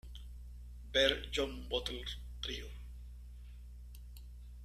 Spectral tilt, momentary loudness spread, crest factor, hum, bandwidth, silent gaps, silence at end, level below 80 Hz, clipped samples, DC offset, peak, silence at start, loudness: -3.5 dB/octave; 23 LU; 26 dB; 60 Hz at -50 dBFS; 14 kHz; none; 0 s; -48 dBFS; under 0.1%; under 0.1%; -14 dBFS; 0.05 s; -36 LUFS